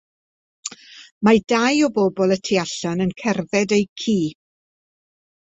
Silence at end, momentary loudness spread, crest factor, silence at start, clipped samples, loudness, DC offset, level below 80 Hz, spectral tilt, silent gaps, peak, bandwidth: 1.25 s; 13 LU; 20 dB; 0.65 s; under 0.1%; -20 LUFS; under 0.1%; -58 dBFS; -5 dB/octave; 1.11-1.21 s, 3.89-3.96 s; -2 dBFS; 8.2 kHz